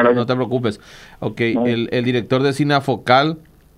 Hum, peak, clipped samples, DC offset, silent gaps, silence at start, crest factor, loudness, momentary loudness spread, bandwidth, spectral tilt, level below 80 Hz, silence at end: none; -2 dBFS; under 0.1%; under 0.1%; none; 0 s; 16 dB; -18 LUFS; 12 LU; 13.5 kHz; -6.5 dB/octave; -54 dBFS; 0.4 s